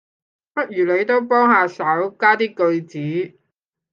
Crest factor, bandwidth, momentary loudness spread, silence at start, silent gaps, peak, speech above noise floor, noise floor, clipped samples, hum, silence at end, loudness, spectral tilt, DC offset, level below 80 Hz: 18 dB; 7.2 kHz; 11 LU; 0.55 s; none; -2 dBFS; 59 dB; -77 dBFS; under 0.1%; none; 0.65 s; -18 LUFS; -7 dB/octave; under 0.1%; -74 dBFS